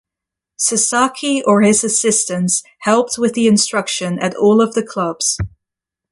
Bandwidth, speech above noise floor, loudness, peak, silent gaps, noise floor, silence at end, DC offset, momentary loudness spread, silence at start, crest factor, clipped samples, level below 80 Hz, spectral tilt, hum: 11.5 kHz; 69 dB; -15 LUFS; -2 dBFS; none; -84 dBFS; 0.65 s; under 0.1%; 7 LU; 0.6 s; 14 dB; under 0.1%; -44 dBFS; -3.5 dB/octave; none